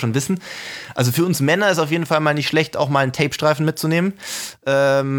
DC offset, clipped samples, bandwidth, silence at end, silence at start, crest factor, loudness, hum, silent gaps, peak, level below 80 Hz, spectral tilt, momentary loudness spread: under 0.1%; under 0.1%; over 20 kHz; 0 s; 0 s; 16 dB; -19 LUFS; none; none; -2 dBFS; -58 dBFS; -5 dB/octave; 10 LU